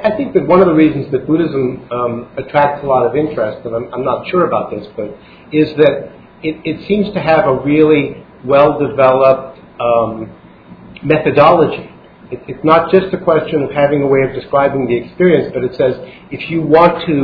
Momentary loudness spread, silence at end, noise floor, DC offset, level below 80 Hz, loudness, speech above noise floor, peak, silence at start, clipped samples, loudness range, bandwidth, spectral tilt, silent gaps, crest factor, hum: 14 LU; 0 s; -37 dBFS; under 0.1%; -44 dBFS; -13 LUFS; 25 dB; 0 dBFS; 0 s; 0.2%; 4 LU; 5.4 kHz; -10 dB/octave; none; 14 dB; none